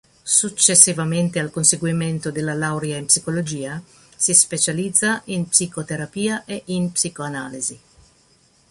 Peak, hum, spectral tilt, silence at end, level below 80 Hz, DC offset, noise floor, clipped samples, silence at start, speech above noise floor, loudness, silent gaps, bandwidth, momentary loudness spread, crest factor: 0 dBFS; none; -3 dB/octave; 0.95 s; -58 dBFS; under 0.1%; -57 dBFS; under 0.1%; 0.25 s; 37 dB; -18 LUFS; none; 14.5 kHz; 14 LU; 22 dB